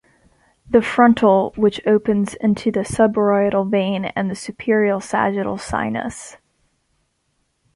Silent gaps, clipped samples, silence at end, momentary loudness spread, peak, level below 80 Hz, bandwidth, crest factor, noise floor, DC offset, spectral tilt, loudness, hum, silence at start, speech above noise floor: none; under 0.1%; 1.4 s; 10 LU; -2 dBFS; -48 dBFS; 11.5 kHz; 18 dB; -68 dBFS; under 0.1%; -6 dB/octave; -18 LUFS; none; 0.7 s; 51 dB